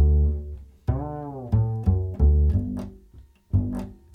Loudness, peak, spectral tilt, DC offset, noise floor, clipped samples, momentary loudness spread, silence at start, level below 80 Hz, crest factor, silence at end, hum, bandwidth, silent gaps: -25 LUFS; -8 dBFS; -11 dB/octave; under 0.1%; -50 dBFS; under 0.1%; 14 LU; 0 s; -26 dBFS; 14 dB; 0.2 s; none; 1.9 kHz; none